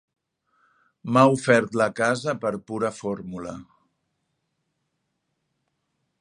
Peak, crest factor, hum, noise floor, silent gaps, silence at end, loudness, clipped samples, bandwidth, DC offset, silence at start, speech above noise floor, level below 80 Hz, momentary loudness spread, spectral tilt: -2 dBFS; 24 dB; none; -77 dBFS; none; 2.6 s; -23 LUFS; under 0.1%; 11 kHz; under 0.1%; 1.05 s; 54 dB; -64 dBFS; 18 LU; -5.5 dB/octave